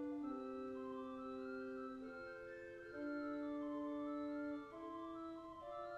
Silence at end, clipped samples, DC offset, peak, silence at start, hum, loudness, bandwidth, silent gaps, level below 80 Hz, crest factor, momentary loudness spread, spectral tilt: 0 s; under 0.1%; under 0.1%; -36 dBFS; 0 s; none; -48 LUFS; 8 kHz; none; -76 dBFS; 12 dB; 7 LU; -6.5 dB/octave